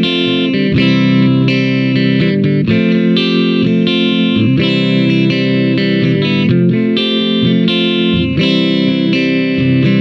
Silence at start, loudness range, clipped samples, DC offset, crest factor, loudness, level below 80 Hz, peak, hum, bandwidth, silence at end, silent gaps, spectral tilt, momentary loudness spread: 0 s; 0 LU; under 0.1%; under 0.1%; 12 dB; -12 LUFS; -44 dBFS; 0 dBFS; none; 7.4 kHz; 0 s; none; -7.5 dB/octave; 2 LU